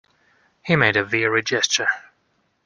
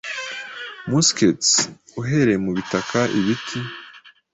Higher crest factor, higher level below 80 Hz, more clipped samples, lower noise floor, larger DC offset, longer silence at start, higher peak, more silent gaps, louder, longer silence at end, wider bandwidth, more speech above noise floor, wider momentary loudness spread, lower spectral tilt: about the same, 20 dB vs 18 dB; about the same, -58 dBFS vs -54 dBFS; neither; first, -67 dBFS vs -46 dBFS; neither; first, 0.65 s vs 0.05 s; about the same, -2 dBFS vs -4 dBFS; neither; about the same, -19 LUFS vs -20 LUFS; first, 0.65 s vs 0.25 s; first, 11 kHz vs 8.4 kHz; first, 47 dB vs 26 dB; second, 9 LU vs 15 LU; about the same, -3 dB/octave vs -3.5 dB/octave